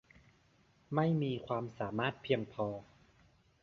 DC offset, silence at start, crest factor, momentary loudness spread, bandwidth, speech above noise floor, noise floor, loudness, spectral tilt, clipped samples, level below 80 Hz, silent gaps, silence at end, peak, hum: under 0.1%; 0.9 s; 22 dB; 7 LU; 6.8 kHz; 34 dB; -69 dBFS; -36 LUFS; -5.5 dB/octave; under 0.1%; -70 dBFS; none; 0.8 s; -16 dBFS; none